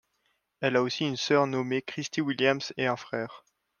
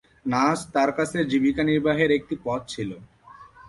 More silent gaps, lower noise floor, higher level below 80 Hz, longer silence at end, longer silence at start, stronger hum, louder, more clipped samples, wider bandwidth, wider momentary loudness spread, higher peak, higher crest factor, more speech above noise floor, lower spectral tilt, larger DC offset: neither; first, -75 dBFS vs -48 dBFS; second, -74 dBFS vs -54 dBFS; first, 0.4 s vs 0 s; first, 0.6 s vs 0.25 s; neither; second, -28 LUFS vs -23 LUFS; neither; second, 10 kHz vs 11.5 kHz; second, 8 LU vs 11 LU; about the same, -8 dBFS vs -8 dBFS; first, 22 dB vs 16 dB; first, 47 dB vs 25 dB; about the same, -4.5 dB/octave vs -5.5 dB/octave; neither